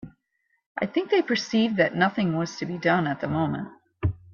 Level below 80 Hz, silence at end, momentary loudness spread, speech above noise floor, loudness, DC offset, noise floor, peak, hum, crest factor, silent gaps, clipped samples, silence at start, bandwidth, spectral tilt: -52 dBFS; 0 s; 9 LU; 49 dB; -25 LUFS; under 0.1%; -73 dBFS; -8 dBFS; none; 18 dB; 0.66-0.75 s; under 0.1%; 0.05 s; 7.2 kHz; -6 dB/octave